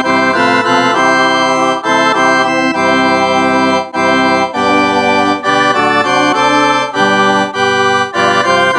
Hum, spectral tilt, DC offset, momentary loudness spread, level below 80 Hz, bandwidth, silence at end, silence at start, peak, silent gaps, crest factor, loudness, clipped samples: none; -3.5 dB/octave; under 0.1%; 2 LU; -54 dBFS; 11.5 kHz; 0 s; 0 s; 0 dBFS; none; 10 dB; -10 LUFS; under 0.1%